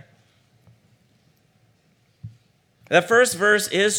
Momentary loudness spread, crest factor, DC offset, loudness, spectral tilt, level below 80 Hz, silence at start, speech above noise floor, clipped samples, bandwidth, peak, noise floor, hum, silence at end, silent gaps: 4 LU; 20 dB; under 0.1%; -18 LUFS; -2.5 dB/octave; -70 dBFS; 2.25 s; 44 dB; under 0.1%; over 20 kHz; -4 dBFS; -62 dBFS; none; 0 s; none